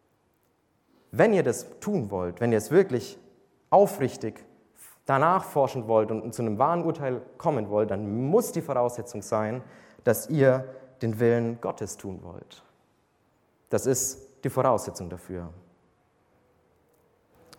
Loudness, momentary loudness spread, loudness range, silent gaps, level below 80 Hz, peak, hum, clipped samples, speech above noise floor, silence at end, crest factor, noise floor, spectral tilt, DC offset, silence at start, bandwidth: -26 LUFS; 16 LU; 5 LU; none; -64 dBFS; -6 dBFS; none; under 0.1%; 44 dB; 2 s; 22 dB; -69 dBFS; -6 dB/octave; under 0.1%; 1.15 s; 17.5 kHz